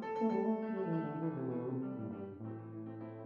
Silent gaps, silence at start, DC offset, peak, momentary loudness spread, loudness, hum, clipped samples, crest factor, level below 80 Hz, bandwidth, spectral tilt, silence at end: none; 0 s; under 0.1%; -24 dBFS; 12 LU; -39 LUFS; none; under 0.1%; 14 dB; -80 dBFS; 6.4 kHz; -10 dB/octave; 0 s